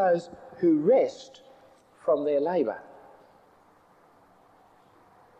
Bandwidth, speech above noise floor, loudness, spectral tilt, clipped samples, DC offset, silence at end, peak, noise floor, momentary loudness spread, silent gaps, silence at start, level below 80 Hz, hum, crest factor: 8.4 kHz; 34 dB; -26 LUFS; -7.5 dB/octave; under 0.1%; under 0.1%; 2.6 s; -12 dBFS; -59 dBFS; 22 LU; none; 0 s; -74 dBFS; none; 16 dB